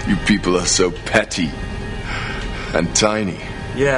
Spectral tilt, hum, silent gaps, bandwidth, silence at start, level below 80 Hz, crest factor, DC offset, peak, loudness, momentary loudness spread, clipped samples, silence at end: -3.5 dB/octave; none; none; 11 kHz; 0 s; -32 dBFS; 18 dB; under 0.1%; 0 dBFS; -19 LUFS; 12 LU; under 0.1%; 0 s